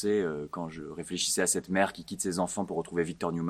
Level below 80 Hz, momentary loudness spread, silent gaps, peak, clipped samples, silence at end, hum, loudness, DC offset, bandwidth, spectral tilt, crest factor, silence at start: -64 dBFS; 11 LU; none; -10 dBFS; under 0.1%; 0 s; none; -31 LUFS; under 0.1%; 16 kHz; -3.5 dB/octave; 22 dB; 0 s